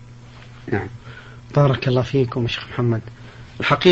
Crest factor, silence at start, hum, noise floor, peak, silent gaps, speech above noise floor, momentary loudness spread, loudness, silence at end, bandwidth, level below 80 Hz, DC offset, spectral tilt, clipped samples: 20 dB; 0 s; none; -41 dBFS; 0 dBFS; none; 22 dB; 23 LU; -21 LUFS; 0 s; 7.6 kHz; -46 dBFS; under 0.1%; -7 dB/octave; under 0.1%